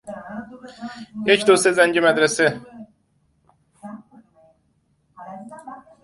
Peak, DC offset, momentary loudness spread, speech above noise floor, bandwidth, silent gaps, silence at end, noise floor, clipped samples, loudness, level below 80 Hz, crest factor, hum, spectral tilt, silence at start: -2 dBFS; under 0.1%; 24 LU; 47 dB; 12 kHz; none; 0.25 s; -65 dBFS; under 0.1%; -17 LUFS; -64 dBFS; 22 dB; none; -3 dB/octave; 0.05 s